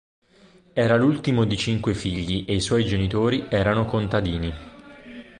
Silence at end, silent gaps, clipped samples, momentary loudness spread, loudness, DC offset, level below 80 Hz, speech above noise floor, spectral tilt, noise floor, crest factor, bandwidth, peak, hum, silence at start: 0.15 s; none; under 0.1%; 11 LU; -23 LUFS; under 0.1%; -40 dBFS; 32 dB; -6 dB/octave; -54 dBFS; 18 dB; 10.5 kHz; -6 dBFS; none; 0.75 s